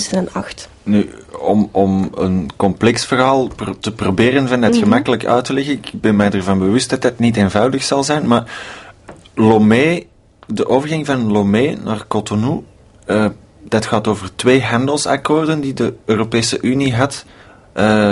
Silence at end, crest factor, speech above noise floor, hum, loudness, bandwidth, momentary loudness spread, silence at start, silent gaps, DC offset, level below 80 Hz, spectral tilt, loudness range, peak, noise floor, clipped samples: 0 s; 16 dB; 24 dB; none; -15 LUFS; 11.5 kHz; 10 LU; 0 s; none; under 0.1%; -46 dBFS; -5.5 dB/octave; 3 LU; 0 dBFS; -39 dBFS; under 0.1%